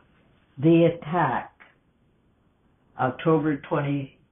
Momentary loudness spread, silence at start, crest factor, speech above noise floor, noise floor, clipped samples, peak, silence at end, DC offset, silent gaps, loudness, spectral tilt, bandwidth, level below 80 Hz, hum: 11 LU; 0.55 s; 16 dB; 42 dB; -64 dBFS; under 0.1%; -10 dBFS; 0.25 s; under 0.1%; none; -24 LUFS; -12 dB/octave; 3.8 kHz; -62 dBFS; none